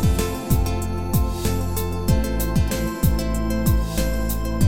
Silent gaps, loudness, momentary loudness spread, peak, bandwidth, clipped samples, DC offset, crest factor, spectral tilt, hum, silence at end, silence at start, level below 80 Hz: none; -23 LUFS; 3 LU; -4 dBFS; 16.5 kHz; under 0.1%; 2%; 16 dB; -6 dB/octave; none; 0 s; 0 s; -24 dBFS